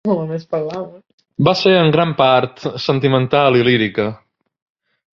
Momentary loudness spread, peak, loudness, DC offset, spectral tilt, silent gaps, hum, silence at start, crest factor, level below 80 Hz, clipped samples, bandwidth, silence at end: 12 LU; 0 dBFS; -15 LUFS; under 0.1%; -7 dB/octave; 1.13-1.18 s; none; 0.05 s; 16 dB; -54 dBFS; under 0.1%; 7.2 kHz; 0.95 s